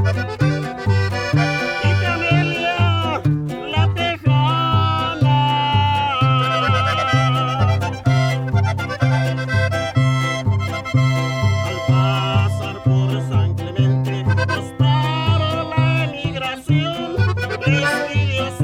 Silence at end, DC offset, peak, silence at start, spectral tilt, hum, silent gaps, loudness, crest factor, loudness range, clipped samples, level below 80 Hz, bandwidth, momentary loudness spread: 0 s; under 0.1%; -4 dBFS; 0 s; -6.5 dB/octave; none; none; -18 LUFS; 14 dB; 2 LU; under 0.1%; -42 dBFS; 11.5 kHz; 4 LU